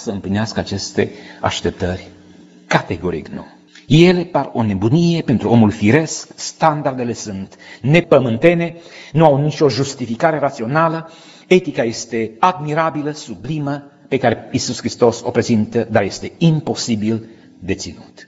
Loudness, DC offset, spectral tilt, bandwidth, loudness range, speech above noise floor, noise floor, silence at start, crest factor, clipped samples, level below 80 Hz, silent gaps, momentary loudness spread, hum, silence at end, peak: -17 LUFS; under 0.1%; -6 dB/octave; 8 kHz; 4 LU; 27 dB; -43 dBFS; 0 s; 16 dB; under 0.1%; -48 dBFS; none; 13 LU; none; 0 s; 0 dBFS